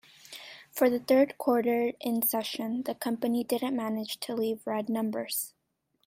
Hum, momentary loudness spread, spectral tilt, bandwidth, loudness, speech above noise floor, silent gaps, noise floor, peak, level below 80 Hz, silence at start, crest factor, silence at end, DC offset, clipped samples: none; 13 LU; -4 dB/octave; 16 kHz; -29 LUFS; 47 dB; none; -76 dBFS; -12 dBFS; -74 dBFS; 0.3 s; 18 dB; 0.55 s; under 0.1%; under 0.1%